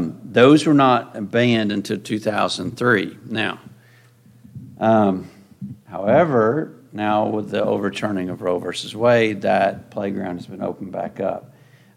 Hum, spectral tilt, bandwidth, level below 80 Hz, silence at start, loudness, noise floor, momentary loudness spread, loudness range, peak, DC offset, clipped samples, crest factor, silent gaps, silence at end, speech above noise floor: none; -6 dB/octave; 14 kHz; -62 dBFS; 0 s; -20 LUFS; -51 dBFS; 14 LU; 4 LU; -2 dBFS; under 0.1%; under 0.1%; 18 dB; none; 0.55 s; 32 dB